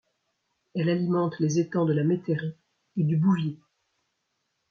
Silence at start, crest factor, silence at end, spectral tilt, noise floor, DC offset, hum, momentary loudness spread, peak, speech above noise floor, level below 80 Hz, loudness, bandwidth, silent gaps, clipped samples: 0.75 s; 14 dB; 1.15 s; -7.5 dB/octave; -78 dBFS; under 0.1%; none; 12 LU; -12 dBFS; 53 dB; -70 dBFS; -26 LUFS; 7 kHz; none; under 0.1%